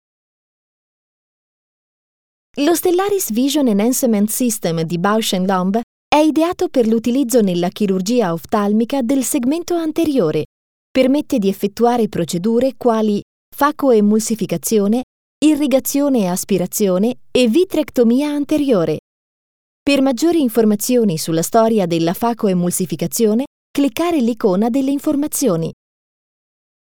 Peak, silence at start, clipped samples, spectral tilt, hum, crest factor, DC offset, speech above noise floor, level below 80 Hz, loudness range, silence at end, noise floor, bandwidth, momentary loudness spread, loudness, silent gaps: 0 dBFS; 2.55 s; under 0.1%; -5 dB/octave; none; 16 dB; 0.8%; over 74 dB; -54 dBFS; 2 LU; 1.1 s; under -90 dBFS; over 20 kHz; 5 LU; -16 LUFS; 5.83-6.11 s, 10.45-10.95 s, 13.22-13.52 s, 15.03-15.41 s, 18.99-19.86 s, 23.47-23.74 s